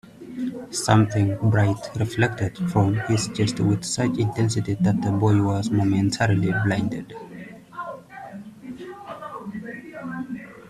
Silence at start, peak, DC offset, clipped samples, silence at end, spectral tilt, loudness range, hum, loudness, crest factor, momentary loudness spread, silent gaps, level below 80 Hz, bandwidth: 0.05 s; -4 dBFS; under 0.1%; under 0.1%; 0 s; -6 dB/octave; 13 LU; none; -22 LUFS; 20 dB; 18 LU; none; -52 dBFS; 12.5 kHz